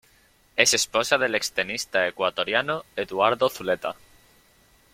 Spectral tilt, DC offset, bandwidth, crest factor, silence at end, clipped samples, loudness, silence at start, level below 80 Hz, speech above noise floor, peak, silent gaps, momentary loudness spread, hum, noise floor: -1.5 dB/octave; under 0.1%; 16.5 kHz; 24 dB; 1 s; under 0.1%; -23 LUFS; 0.55 s; -62 dBFS; 35 dB; -2 dBFS; none; 10 LU; none; -60 dBFS